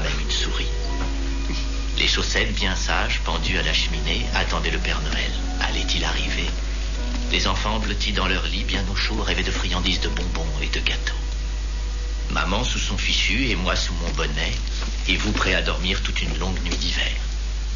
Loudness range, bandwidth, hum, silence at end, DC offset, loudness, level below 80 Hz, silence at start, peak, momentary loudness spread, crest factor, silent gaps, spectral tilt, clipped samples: 2 LU; 7.4 kHz; none; 0 s; 0.5%; -23 LUFS; -24 dBFS; 0 s; -6 dBFS; 7 LU; 16 dB; none; -3.5 dB/octave; under 0.1%